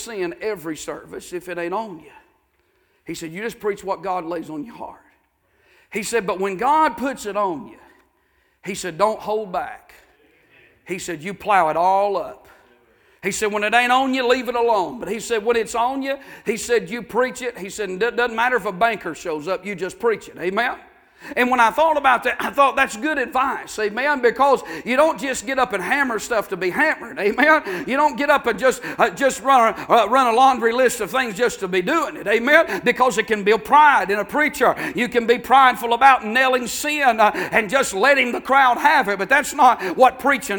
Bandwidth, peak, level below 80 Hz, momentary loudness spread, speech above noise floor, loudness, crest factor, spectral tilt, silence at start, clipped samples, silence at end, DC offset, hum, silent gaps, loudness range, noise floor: 19.5 kHz; 0 dBFS; -56 dBFS; 13 LU; 45 dB; -19 LUFS; 20 dB; -3 dB/octave; 0 s; under 0.1%; 0 s; under 0.1%; none; none; 11 LU; -64 dBFS